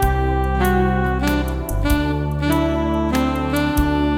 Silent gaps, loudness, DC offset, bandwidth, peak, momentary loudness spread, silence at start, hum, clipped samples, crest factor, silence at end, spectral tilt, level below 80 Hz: none; -19 LUFS; under 0.1%; 16.5 kHz; -4 dBFS; 4 LU; 0 s; none; under 0.1%; 14 dB; 0 s; -6.5 dB/octave; -24 dBFS